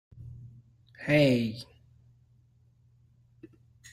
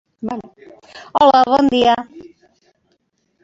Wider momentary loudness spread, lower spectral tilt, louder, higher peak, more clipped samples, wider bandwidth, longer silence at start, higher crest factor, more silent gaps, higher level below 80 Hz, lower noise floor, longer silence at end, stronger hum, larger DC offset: first, 26 LU vs 17 LU; first, -7 dB/octave vs -5 dB/octave; second, -26 LUFS vs -15 LUFS; second, -12 dBFS vs -2 dBFS; neither; first, 15.5 kHz vs 7.8 kHz; about the same, 0.15 s vs 0.25 s; about the same, 20 dB vs 16 dB; neither; second, -62 dBFS vs -54 dBFS; about the same, -63 dBFS vs -65 dBFS; first, 2.3 s vs 1.2 s; neither; neither